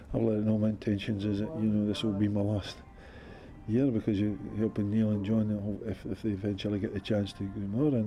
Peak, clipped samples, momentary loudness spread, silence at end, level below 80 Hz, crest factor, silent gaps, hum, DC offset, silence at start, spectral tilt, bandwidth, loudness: -16 dBFS; under 0.1%; 11 LU; 0 s; -52 dBFS; 14 dB; none; none; under 0.1%; 0 s; -8 dB/octave; 10.5 kHz; -31 LUFS